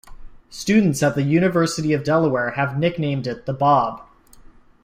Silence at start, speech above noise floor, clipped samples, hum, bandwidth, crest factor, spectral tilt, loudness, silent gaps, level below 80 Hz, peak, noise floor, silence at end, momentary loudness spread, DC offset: 0.1 s; 27 dB; under 0.1%; none; 15.5 kHz; 16 dB; -6 dB/octave; -20 LUFS; none; -48 dBFS; -4 dBFS; -46 dBFS; 0.8 s; 10 LU; under 0.1%